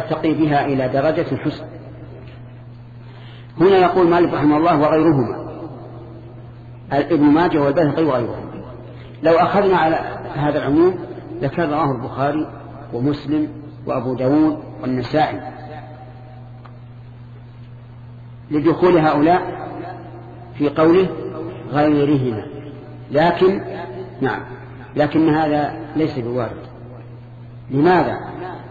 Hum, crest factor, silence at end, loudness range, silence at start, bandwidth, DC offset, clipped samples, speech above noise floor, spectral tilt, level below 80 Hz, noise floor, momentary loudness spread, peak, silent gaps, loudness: none; 16 dB; 0 s; 6 LU; 0 s; 7 kHz; under 0.1%; under 0.1%; 21 dB; -9 dB/octave; -46 dBFS; -37 dBFS; 24 LU; -2 dBFS; none; -18 LUFS